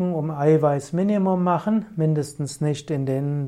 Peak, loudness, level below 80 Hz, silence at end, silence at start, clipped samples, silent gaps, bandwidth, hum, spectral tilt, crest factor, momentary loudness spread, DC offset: -8 dBFS; -22 LUFS; -60 dBFS; 0 s; 0 s; under 0.1%; none; 12 kHz; none; -8 dB/octave; 14 dB; 7 LU; under 0.1%